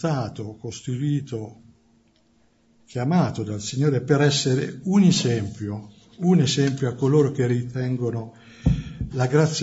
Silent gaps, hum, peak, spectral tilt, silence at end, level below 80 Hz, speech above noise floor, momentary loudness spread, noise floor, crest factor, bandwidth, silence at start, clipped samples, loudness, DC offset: none; none; -6 dBFS; -6 dB/octave; 0 s; -42 dBFS; 40 dB; 15 LU; -62 dBFS; 18 dB; 8 kHz; 0 s; under 0.1%; -23 LUFS; under 0.1%